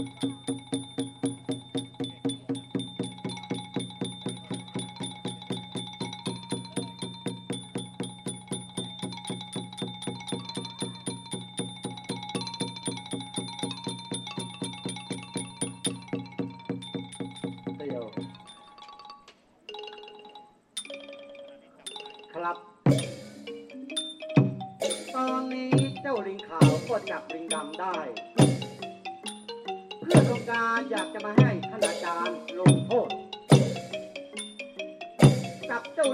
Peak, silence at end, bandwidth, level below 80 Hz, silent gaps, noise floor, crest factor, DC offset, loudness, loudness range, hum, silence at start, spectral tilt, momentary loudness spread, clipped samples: -6 dBFS; 0 s; 13 kHz; -62 dBFS; none; -57 dBFS; 24 dB; under 0.1%; -30 LUFS; 13 LU; none; 0 s; -5.5 dB/octave; 17 LU; under 0.1%